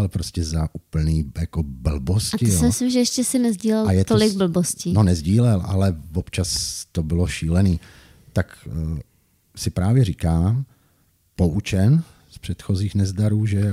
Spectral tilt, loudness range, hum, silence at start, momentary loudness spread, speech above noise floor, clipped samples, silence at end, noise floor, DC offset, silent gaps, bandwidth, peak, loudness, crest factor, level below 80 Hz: -6 dB/octave; 5 LU; none; 0 s; 10 LU; 42 dB; under 0.1%; 0 s; -62 dBFS; under 0.1%; none; 15.5 kHz; -4 dBFS; -21 LUFS; 16 dB; -34 dBFS